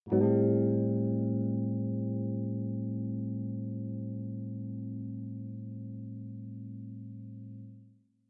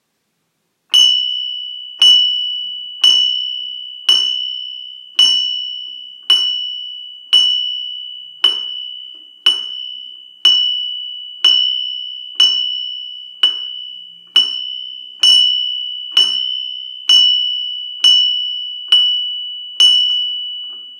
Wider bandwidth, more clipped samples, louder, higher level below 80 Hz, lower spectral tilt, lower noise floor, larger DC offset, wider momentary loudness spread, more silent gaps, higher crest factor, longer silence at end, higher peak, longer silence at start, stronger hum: second, 2.3 kHz vs 15.5 kHz; neither; second, -34 LUFS vs -12 LUFS; first, -74 dBFS vs -86 dBFS; first, -14.5 dB/octave vs 3.5 dB/octave; second, -60 dBFS vs -68 dBFS; neither; about the same, 18 LU vs 17 LU; neither; about the same, 18 dB vs 16 dB; first, 0.4 s vs 0 s; second, -14 dBFS vs 0 dBFS; second, 0.05 s vs 0.9 s; neither